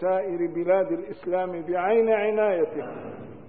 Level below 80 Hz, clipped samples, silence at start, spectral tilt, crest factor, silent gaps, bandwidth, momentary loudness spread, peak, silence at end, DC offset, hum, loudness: -66 dBFS; under 0.1%; 0 s; -10.5 dB/octave; 14 dB; none; 4.3 kHz; 13 LU; -10 dBFS; 0 s; 0.3%; none; -25 LUFS